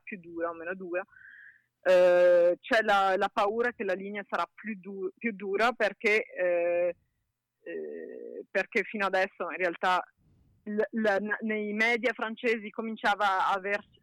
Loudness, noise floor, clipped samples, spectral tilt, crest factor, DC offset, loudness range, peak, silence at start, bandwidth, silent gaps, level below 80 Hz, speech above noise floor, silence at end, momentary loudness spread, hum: -28 LUFS; -81 dBFS; under 0.1%; -4.5 dB/octave; 14 dB; under 0.1%; 6 LU; -14 dBFS; 0.05 s; 12 kHz; none; -70 dBFS; 53 dB; 0.2 s; 15 LU; none